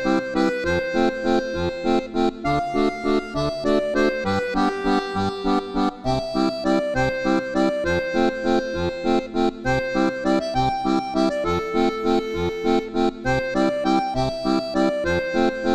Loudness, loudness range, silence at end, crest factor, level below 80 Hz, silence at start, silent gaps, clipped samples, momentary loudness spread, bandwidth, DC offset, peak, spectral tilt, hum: -22 LUFS; 0 LU; 0 s; 14 dB; -40 dBFS; 0 s; none; under 0.1%; 3 LU; 12.5 kHz; under 0.1%; -6 dBFS; -6 dB/octave; none